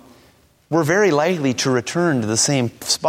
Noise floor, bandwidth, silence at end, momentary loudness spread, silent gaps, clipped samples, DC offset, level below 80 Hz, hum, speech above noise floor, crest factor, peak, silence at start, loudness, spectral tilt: -54 dBFS; 16.5 kHz; 0 s; 5 LU; none; under 0.1%; under 0.1%; -58 dBFS; none; 36 dB; 16 dB; -4 dBFS; 0.7 s; -18 LUFS; -4 dB/octave